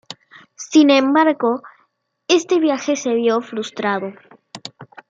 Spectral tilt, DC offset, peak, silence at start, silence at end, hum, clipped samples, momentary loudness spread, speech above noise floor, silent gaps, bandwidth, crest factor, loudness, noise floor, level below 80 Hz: -3.5 dB/octave; under 0.1%; -2 dBFS; 0.1 s; 0.25 s; none; under 0.1%; 22 LU; 47 dB; none; 7.8 kHz; 16 dB; -17 LUFS; -64 dBFS; -74 dBFS